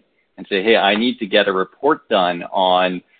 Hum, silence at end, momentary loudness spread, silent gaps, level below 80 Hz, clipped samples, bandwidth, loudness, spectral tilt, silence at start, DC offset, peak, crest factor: none; 0.2 s; 5 LU; none; -62 dBFS; under 0.1%; 4.7 kHz; -17 LUFS; -9.5 dB/octave; 0.4 s; under 0.1%; -2 dBFS; 16 dB